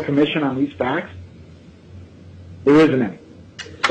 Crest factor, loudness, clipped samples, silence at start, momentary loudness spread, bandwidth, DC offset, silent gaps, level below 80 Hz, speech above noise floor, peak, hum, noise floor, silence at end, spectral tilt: 16 dB; -18 LUFS; under 0.1%; 0 s; 26 LU; 8.8 kHz; under 0.1%; none; -52 dBFS; 26 dB; -4 dBFS; none; -43 dBFS; 0 s; -6.5 dB/octave